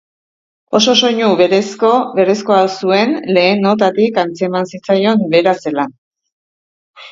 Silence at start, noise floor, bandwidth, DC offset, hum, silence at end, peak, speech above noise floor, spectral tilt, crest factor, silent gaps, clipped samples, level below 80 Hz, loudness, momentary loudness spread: 0.7 s; under -90 dBFS; 7.8 kHz; under 0.1%; none; 0 s; 0 dBFS; over 77 dB; -4.5 dB/octave; 14 dB; 5.98-6.11 s, 6.32-6.94 s; under 0.1%; -62 dBFS; -13 LUFS; 7 LU